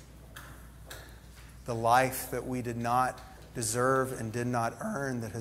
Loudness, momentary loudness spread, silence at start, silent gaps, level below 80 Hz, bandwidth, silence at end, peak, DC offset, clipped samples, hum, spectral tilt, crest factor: -31 LUFS; 23 LU; 0 s; none; -54 dBFS; 16 kHz; 0 s; -12 dBFS; under 0.1%; under 0.1%; none; -5 dB/octave; 20 dB